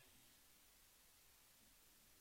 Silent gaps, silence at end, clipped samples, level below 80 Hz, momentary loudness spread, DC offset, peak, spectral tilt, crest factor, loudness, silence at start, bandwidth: none; 0 s; under 0.1%; -82 dBFS; 1 LU; under 0.1%; -56 dBFS; -1 dB/octave; 14 dB; -68 LUFS; 0 s; 16.5 kHz